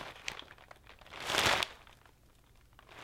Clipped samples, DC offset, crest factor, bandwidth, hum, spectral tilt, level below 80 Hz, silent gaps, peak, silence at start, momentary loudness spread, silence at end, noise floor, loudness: under 0.1%; under 0.1%; 26 dB; 16.5 kHz; none; -1.5 dB/octave; -60 dBFS; none; -12 dBFS; 0 s; 27 LU; 0 s; -63 dBFS; -33 LUFS